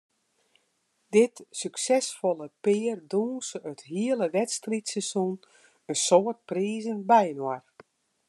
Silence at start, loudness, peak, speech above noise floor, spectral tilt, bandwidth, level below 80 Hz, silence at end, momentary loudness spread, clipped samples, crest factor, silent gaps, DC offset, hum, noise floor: 1.1 s; -27 LUFS; -6 dBFS; 46 dB; -4 dB/octave; 12.5 kHz; -86 dBFS; 0.7 s; 12 LU; under 0.1%; 20 dB; none; under 0.1%; none; -73 dBFS